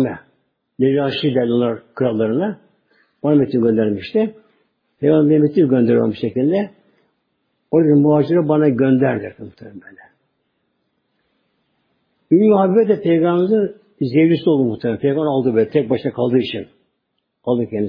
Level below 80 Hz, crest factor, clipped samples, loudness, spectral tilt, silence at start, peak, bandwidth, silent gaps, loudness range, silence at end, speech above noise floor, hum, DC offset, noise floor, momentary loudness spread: -60 dBFS; 16 dB; under 0.1%; -17 LUFS; -10.5 dB/octave; 0 s; -2 dBFS; 5.2 kHz; none; 4 LU; 0 s; 56 dB; none; under 0.1%; -72 dBFS; 11 LU